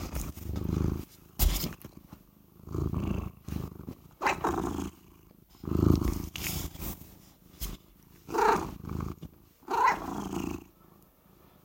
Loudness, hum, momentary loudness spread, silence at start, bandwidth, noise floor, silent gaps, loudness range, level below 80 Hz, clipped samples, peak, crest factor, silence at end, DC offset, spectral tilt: -32 LUFS; none; 20 LU; 0 s; 16.5 kHz; -60 dBFS; none; 3 LU; -42 dBFS; under 0.1%; -8 dBFS; 26 dB; 1 s; under 0.1%; -5.5 dB/octave